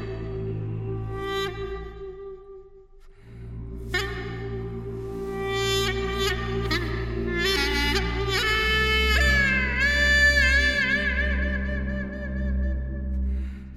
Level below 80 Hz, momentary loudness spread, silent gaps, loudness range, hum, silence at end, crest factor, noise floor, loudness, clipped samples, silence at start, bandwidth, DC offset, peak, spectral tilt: -30 dBFS; 15 LU; none; 14 LU; none; 0 s; 16 dB; -48 dBFS; -24 LUFS; under 0.1%; 0 s; 14.5 kHz; under 0.1%; -8 dBFS; -4 dB/octave